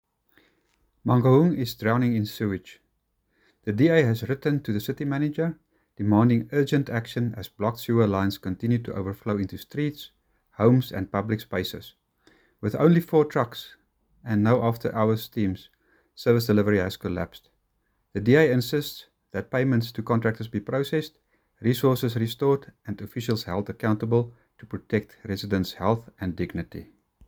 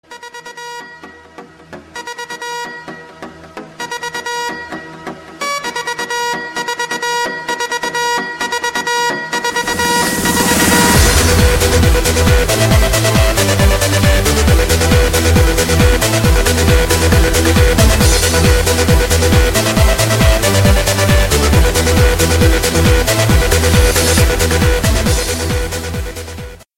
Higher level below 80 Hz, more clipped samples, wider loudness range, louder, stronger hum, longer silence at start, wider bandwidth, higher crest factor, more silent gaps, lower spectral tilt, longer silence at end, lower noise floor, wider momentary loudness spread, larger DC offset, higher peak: second, -58 dBFS vs -18 dBFS; neither; second, 3 LU vs 13 LU; second, -25 LUFS vs -12 LUFS; neither; first, 1.05 s vs 0.1 s; first, over 20 kHz vs 16.5 kHz; first, 20 dB vs 12 dB; neither; first, -7.5 dB/octave vs -4 dB/octave; first, 0.45 s vs 0.2 s; first, -73 dBFS vs -37 dBFS; about the same, 15 LU vs 16 LU; neither; second, -4 dBFS vs 0 dBFS